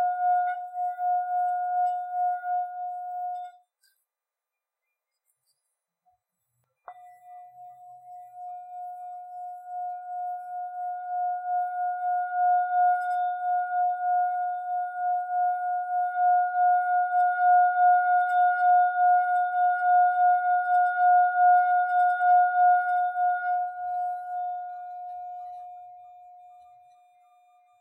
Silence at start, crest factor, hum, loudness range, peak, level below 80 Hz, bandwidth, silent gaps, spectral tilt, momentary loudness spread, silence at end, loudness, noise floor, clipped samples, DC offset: 0 s; 14 dB; none; 18 LU; -12 dBFS; -86 dBFS; 3.8 kHz; none; -1 dB/octave; 18 LU; 1.35 s; -25 LUFS; -89 dBFS; under 0.1%; under 0.1%